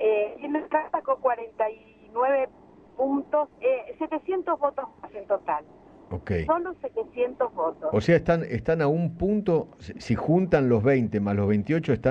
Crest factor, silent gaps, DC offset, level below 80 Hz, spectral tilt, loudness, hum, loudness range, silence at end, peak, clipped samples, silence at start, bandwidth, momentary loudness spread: 18 dB; none; under 0.1%; -50 dBFS; -8.5 dB/octave; -26 LUFS; none; 5 LU; 0 s; -8 dBFS; under 0.1%; 0 s; 8.2 kHz; 11 LU